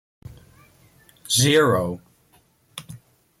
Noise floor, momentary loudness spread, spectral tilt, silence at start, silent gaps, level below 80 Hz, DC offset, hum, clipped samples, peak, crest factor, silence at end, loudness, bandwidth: -60 dBFS; 24 LU; -3.5 dB/octave; 0.25 s; none; -56 dBFS; under 0.1%; none; under 0.1%; -6 dBFS; 20 dB; 0.45 s; -19 LUFS; 16 kHz